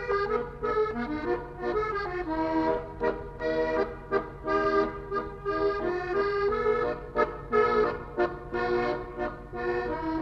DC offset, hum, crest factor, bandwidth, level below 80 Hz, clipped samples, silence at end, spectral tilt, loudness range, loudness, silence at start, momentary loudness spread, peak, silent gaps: under 0.1%; none; 16 dB; 7 kHz; -46 dBFS; under 0.1%; 0 s; -7.5 dB/octave; 2 LU; -29 LUFS; 0 s; 6 LU; -12 dBFS; none